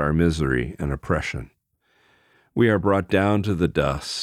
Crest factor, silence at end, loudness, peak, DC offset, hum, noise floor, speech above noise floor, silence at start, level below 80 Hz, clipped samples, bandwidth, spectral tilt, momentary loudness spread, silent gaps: 16 dB; 0 s; -22 LUFS; -6 dBFS; under 0.1%; none; -66 dBFS; 44 dB; 0 s; -38 dBFS; under 0.1%; 14 kHz; -6.5 dB/octave; 9 LU; none